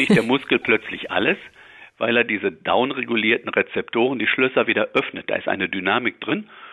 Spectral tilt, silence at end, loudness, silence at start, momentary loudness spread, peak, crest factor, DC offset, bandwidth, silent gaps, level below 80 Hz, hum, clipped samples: -6 dB/octave; 0 s; -21 LUFS; 0 s; 7 LU; -4 dBFS; 16 dB; under 0.1%; 12.5 kHz; none; -60 dBFS; none; under 0.1%